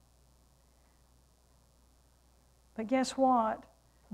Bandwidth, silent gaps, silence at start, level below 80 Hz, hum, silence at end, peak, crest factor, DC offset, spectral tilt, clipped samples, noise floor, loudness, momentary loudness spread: 12.5 kHz; none; 2.8 s; -66 dBFS; none; 0.5 s; -18 dBFS; 20 dB; under 0.1%; -4.5 dB/octave; under 0.1%; -66 dBFS; -31 LUFS; 15 LU